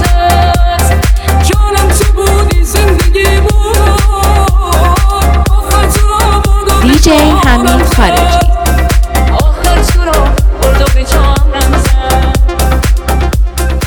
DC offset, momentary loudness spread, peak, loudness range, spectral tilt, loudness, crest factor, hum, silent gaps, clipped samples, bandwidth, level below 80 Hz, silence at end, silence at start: under 0.1%; 3 LU; 0 dBFS; 2 LU; -5 dB/octave; -9 LUFS; 6 dB; none; none; 0.3%; 19.5 kHz; -8 dBFS; 0 s; 0 s